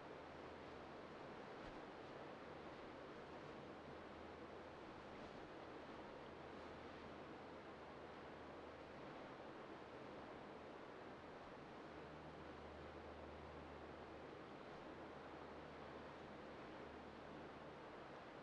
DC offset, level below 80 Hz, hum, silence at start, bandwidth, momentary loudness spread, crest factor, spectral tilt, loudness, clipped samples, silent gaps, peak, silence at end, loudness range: under 0.1%; -74 dBFS; none; 0 s; 9.4 kHz; 1 LU; 14 dB; -6 dB/octave; -57 LUFS; under 0.1%; none; -42 dBFS; 0 s; 1 LU